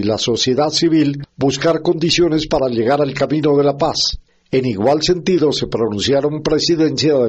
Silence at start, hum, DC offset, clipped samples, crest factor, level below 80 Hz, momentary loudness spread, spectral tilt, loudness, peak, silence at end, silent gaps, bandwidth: 0 s; none; under 0.1%; under 0.1%; 12 dB; -40 dBFS; 5 LU; -5 dB/octave; -16 LUFS; -2 dBFS; 0 s; none; 8.4 kHz